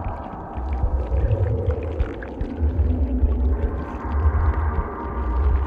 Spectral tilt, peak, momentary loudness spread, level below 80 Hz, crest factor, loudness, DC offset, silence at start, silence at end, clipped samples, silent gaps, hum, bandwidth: -10.5 dB/octave; -8 dBFS; 8 LU; -24 dBFS; 14 dB; -24 LUFS; under 0.1%; 0 s; 0 s; under 0.1%; none; none; 3.6 kHz